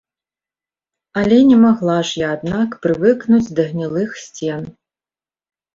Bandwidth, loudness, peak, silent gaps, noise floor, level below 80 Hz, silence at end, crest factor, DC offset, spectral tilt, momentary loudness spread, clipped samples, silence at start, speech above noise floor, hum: 7.6 kHz; -16 LUFS; -2 dBFS; none; under -90 dBFS; -52 dBFS; 1.05 s; 16 dB; under 0.1%; -6.5 dB/octave; 15 LU; under 0.1%; 1.15 s; over 75 dB; none